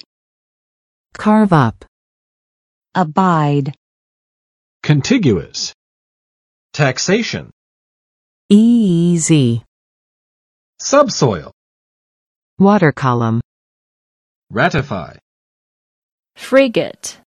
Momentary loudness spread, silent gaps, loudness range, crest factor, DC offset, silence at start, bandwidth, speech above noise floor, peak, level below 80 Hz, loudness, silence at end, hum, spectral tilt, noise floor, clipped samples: 14 LU; 1.88-2.82 s, 3.77-4.80 s, 5.74-6.70 s, 7.53-8.49 s, 9.68-10.73 s, 11.53-12.57 s, 13.44-14.47 s, 15.22-16.23 s; 5 LU; 18 dB; under 0.1%; 1.2 s; 12 kHz; over 77 dB; 0 dBFS; -50 dBFS; -15 LUFS; 0.2 s; none; -5.5 dB/octave; under -90 dBFS; under 0.1%